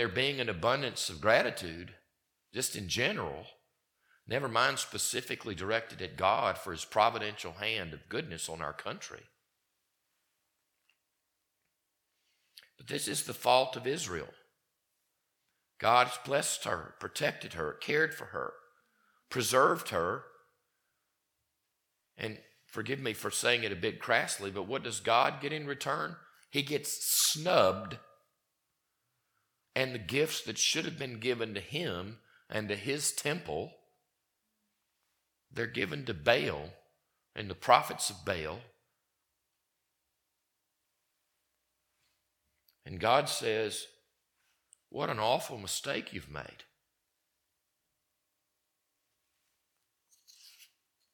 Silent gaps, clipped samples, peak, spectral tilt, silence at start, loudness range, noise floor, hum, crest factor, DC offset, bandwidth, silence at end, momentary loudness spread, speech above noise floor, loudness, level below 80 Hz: none; under 0.1%; -6 dBFS; -2.5 dB/octave; 0 s; 8 LU; -83 dBFS; none; 30 dB; under 0.1%; 19 kHz; 0.5 s; 15 LU; 50 dB; -32 LUFS; -68 dBFS